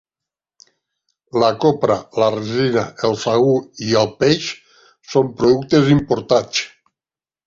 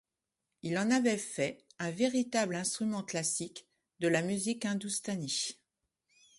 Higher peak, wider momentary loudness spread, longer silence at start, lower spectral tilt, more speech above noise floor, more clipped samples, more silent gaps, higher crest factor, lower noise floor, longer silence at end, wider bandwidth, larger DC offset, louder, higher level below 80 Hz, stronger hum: first, -2 dBFS vs -16 dBFS; about the same, 7 LU vs 9 LU; first, 1.35 s vs 0.65 s; first, -5.5 dB/octave vs -3.5 dB/octave; first, over 74 dB vs 55 dB; neither; neither; about the same, 18 dB vs 20 dB; about the same, under -90 dBFS vs -88 dBFS; about the same, 0.8 s vs 0.85 s; second, 7.6 kHz vs 11.5 kHz; neither; first, -17 LUFS vs -33 LUFS; first, -50 dBFS vs -76 dBFS; neither